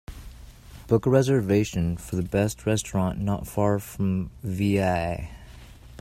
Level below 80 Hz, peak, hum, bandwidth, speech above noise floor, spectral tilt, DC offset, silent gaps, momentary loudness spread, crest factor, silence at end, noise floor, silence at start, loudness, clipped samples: -44 dBFS; -6 dBFS; none; 16 kHz; 21 dB; -6.5 dB/octave; under 0.1%; none; 12 LU; 20 dB; 0 s; -45 dBFS; 0.1 s; -25 LUFS; under 0.1%